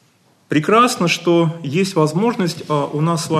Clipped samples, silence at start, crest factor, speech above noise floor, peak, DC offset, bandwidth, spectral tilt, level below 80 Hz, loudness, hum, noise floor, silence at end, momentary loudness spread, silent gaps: under 0.1%; 0.5 s; 16 dB; 40 dB; -2 dBFS; under 0.1%; 13 kHz; -5.5 dB/octave; -64 dBFS; -17 LUFS; none; -56 dBFS; 0 s; 7 LU; none